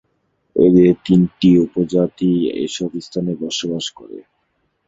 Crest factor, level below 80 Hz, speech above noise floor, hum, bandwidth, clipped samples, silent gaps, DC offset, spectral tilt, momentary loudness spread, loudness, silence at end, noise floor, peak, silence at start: 16 dB; -50 dBFS; 51 dB; none; 7.8 kHz; under 0.1%; none; under 0.1%; -6.5 dB/octave; 12 LU; -16 LUFS; 0.7 s; -67 dBFS; -2 dBFS; 0.55 s